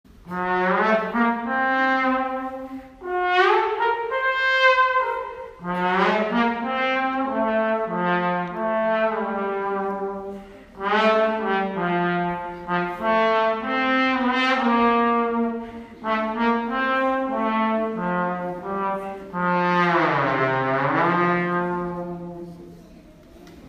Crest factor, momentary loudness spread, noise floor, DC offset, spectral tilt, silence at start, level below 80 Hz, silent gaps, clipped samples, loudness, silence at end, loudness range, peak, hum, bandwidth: 18 dB; 11 LU; -46 dBFS; under 0.1%; -6.5 dB/octave; 0.25 s; -54 dBFS; none; under 0.1%; -22 LUFS; 0 s; 3 LU; -4 dBFS; none; 9.2 kHz